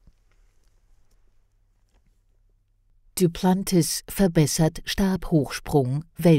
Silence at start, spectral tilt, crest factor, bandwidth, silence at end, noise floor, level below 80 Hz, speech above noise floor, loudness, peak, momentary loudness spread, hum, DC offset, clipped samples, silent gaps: 3.15 s; -5.5 dB/octave; 18 dB; 16 kHz; 0 s; -63 dBFS; -44 dBFS; 42 dB; -23 LUFS; -6 dBFS; 5 LU; none; under 0.1%; under 0.1%; none